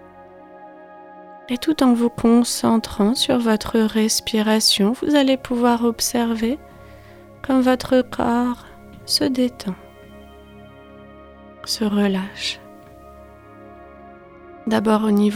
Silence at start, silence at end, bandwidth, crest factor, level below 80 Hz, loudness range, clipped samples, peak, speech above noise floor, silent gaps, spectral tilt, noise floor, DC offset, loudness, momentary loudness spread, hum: 0.2 s; 0 s; 17.5 kHz; 16 dB; -48 dBFS; 9 LU; under 0.1%; -4 dBFS; 25 dB; none; -4 dB/octave; -43 dBFS; under 0.1%; -19 LUFS; 14 LU; none